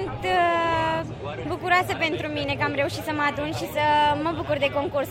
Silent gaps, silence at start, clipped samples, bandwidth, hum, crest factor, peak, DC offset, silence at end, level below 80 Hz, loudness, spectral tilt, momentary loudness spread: none; 0 s; under 0.1%; 16 kHz; none; 16 dB; -8 dBFS; under 0.1%; 0 s; -48 dBFS; -24 LUFS; -5 dB/octave; 8 LU